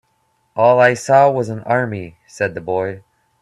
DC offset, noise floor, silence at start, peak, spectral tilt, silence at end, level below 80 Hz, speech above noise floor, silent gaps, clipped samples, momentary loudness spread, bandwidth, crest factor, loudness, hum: under 0.1%; -63 dBFS; 0.55 s; 0 dBFS; -6 dB/octave; 0.45 s; -60 dBFS; 48 dB; none; under 0.1%; 18 LU; 12 kHz; 16 dB; -16 LUFS; none